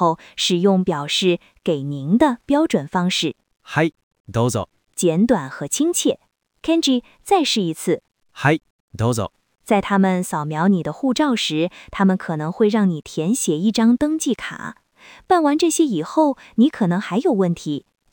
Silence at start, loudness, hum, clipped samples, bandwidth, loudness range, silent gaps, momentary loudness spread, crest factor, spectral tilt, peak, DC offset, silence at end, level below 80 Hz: 0 s; -20 LUFS; none; under 0.1%; 19.5 kHz; 2 LU; 4.03-4.11 s, 4.20-4.24 s, 8.70-8.88 s; 8 LU; 16 dB; -5 dB/octave; -2 dBFS; under 0.1%; 0.35 s; -54 dBFS